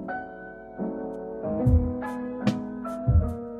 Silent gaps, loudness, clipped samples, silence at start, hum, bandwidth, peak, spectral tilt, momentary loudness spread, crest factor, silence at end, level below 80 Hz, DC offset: none; -28 LUFS; under 0.1%; 0 s; none; 7.8 kHz; -10 dBFS; -9 dB/octave; 12 LU; 16 dB; 0 s; -34 dBFS; under 0.1%